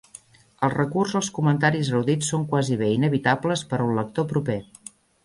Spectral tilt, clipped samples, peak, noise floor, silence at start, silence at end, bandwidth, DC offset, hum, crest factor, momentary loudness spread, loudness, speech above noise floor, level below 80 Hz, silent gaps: -5.5 dB/octave; under 0.1%; -6 dBFS; -49 dBFS; 0.6 s; 0.6 s; 11.5 kHz; under 0.1%; none; 18 dB; 7 LU; -23 LUFS; 27 dB; -58 dBFS; none